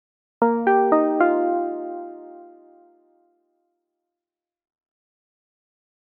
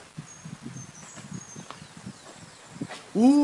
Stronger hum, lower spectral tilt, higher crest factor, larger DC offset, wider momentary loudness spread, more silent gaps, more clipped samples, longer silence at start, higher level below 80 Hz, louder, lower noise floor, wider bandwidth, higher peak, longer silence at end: neither; about the same, -6 dB/octave vs -5.5 dB/octave; about the same, 20 dB vs 20 dB; neither; about the same, 20 LU vs 18 LU; neither; neither; first, 0.4 s vs 0.2 s; about the same, -74 dBFS vs -70 dBFS; first, -20 LUFS vs -31 LUFS; first, -90 dBFS vs -47 dBFS; second, 3.6 kHz vs 11.5 kHz; first, -6 dBFS vs -10 dBFS; first, 3.6 s vs 0 s